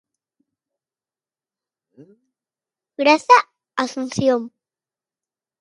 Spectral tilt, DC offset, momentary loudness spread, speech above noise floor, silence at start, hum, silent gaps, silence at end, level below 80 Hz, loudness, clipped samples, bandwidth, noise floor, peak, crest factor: -4 dB/octave; under 0.1%; 13 LU; over 72 dB; 3 s; none; none; 1.15 s; -64 dBFS; -18 LUFS; under 0.1%; 11.5 kHz; under -90 dBFS; 0 dBFS; 22 dB